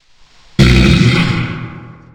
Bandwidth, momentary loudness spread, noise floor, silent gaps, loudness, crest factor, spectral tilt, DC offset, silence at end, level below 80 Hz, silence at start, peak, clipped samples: 15.5 kHz; 16 LU; -44 dBFS; none; -11 LUFS; 12 dB; -6 dB/octave; under 0.1%; 0.25 s; -22 dBFS; 0.6 s; 0 dBFS; under 0.1%